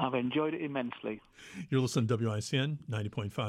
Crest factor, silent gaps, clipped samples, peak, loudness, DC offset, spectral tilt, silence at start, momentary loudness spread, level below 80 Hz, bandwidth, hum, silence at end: 18 dB; none; under 0.1%; -14 dBFS; -33 LUFS; under 0.1%; -6 dB/octave; 0 s; 11 LU; -68 dBFS; 14 kHz; none; 0 s